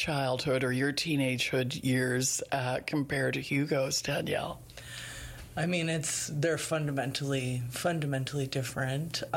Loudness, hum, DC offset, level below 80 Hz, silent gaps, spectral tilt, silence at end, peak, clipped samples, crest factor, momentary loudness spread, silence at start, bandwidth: -31 LUFS; none; under 0.1%; -58 dBFS; none; -4.5 dB/octave; 0 s; -18 dBFS; under 0.1%; 12 dB; 7 LU; 0 s; 16.5 kHz